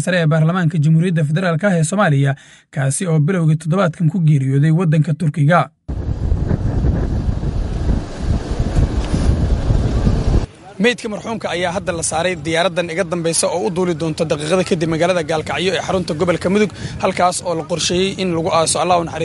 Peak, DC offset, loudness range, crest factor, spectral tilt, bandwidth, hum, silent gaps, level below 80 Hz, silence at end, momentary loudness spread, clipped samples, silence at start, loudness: 0 dBFS; under 0.1%; 3 LU; 16 dB; -5.5 dB/octave; 11.5 kHz; none; none; -26 dBFS; 0 s; 7 LU; under 0.1%; 0 s; -17 LUFS